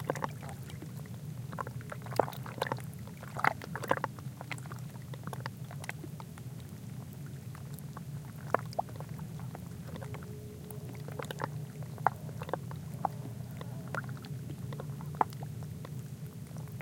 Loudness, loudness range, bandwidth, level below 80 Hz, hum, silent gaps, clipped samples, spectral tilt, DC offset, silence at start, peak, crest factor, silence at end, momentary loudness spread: -40 LUFS; 7 LU; 17 kHz; -62 dBFS; none; none; under 0.1%; -6 dB/octave; under 0.1%; 0 s; -6 dBFS; 32 dB; 0 s; 10 LU